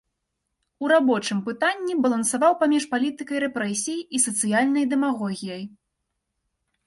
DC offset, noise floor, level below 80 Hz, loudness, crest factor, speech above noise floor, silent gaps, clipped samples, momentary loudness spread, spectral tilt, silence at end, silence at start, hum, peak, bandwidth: under 0.1%; -79 dBFS; -70 dBFS; -23 LUFS; 18 dB; 56 dB; none; under 0.1%; 10 LU; -3.5 dB/octave; 1.2 s; 0.8 s; none; -6 dBFS; 11.5 kHz